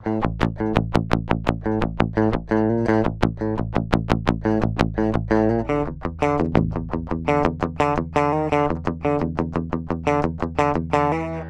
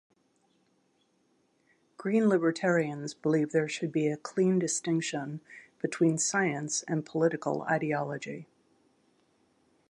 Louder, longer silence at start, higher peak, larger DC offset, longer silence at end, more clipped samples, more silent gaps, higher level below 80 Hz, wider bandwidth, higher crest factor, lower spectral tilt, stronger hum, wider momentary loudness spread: first, -22 LUFS vs -29 LUFS; second, 0 s vs 2 s; first, -2 dBFS vs -14 dBFS; neither; second, 0 s vs 1.45 s; neither; neither; first, -34 dBFS vs -80 dBFS; about the same, 10.5 kHz vs 11.5 kHz; about the same, 18 dB vs 18 dB; first, -8 dB/octave vs -5 dB/octave; neither; second, 5 LU vs 11 LU